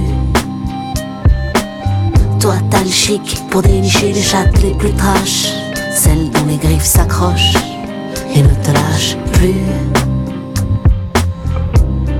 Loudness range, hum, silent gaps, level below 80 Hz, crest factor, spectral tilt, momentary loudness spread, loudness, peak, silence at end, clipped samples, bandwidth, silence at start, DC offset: 2 LU; none; none; -18 dBFS; 12 dB; -4.5 dB/octave; 8 LU; -13 LUFS; 0 dBFS; 0 s; under 0.1%; 18 kHz; 0 s; under 0.1%